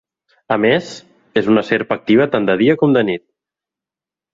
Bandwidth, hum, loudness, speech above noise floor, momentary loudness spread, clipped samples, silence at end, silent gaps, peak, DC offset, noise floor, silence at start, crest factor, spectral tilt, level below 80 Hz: 7.8 kHz; none; -15 LUFS; 74 dB; 9 LU; under 0.1%; 1.15 s; none; -2 dBFS; under 0.1%; -89 dBFS; 0.5 s; 16 dB; -6.5 dB/octave; -58 dBFS